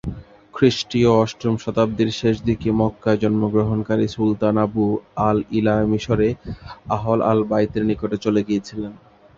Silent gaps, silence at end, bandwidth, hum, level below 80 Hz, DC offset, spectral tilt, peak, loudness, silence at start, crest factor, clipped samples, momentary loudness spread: none; 0.4 s; 7.6 kHz; none; -44 dBFS; under 0.1%; -7 dB/octave; -2 dBFS; -20 LUFS; 0.05 s; 18 dB; under 0.1%; 9 LU